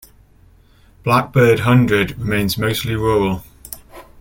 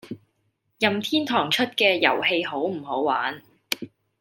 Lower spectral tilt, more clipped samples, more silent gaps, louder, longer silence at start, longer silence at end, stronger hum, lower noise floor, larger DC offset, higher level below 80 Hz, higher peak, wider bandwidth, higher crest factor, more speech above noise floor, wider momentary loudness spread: first, -6 dB/octave vs -3.5 dB/octave; neither; neither; first, -16 LUFS vs -23 LUFS; first, 1.05 s vs 0.05 s; second, 0.2 s vs 0.35 s; neither; second, -49 dBFS vs -72 dBFS; neither; first, -40 dBFS vs -72 dBFS; about the same, -2 dBFS vs -2 dBFS; about the same, 17 kHz vs 17 kHz; second, 16 dB vs 22 dB; second, 34 dB vs 48 dB; first, 20 LU vs 16 LU